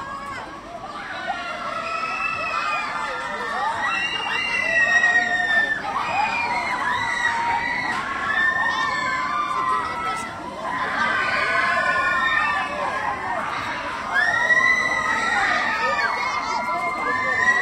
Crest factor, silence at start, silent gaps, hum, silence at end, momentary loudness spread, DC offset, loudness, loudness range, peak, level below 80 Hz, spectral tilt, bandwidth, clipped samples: 16 dB; 0 s; none; none; 0 s; 10 LU; under 0.1%; -21 LUFS; 4 LU; -6 dBFS; -54 dBFS; -2.5 dB/octave; 16 kHz; under 0.1%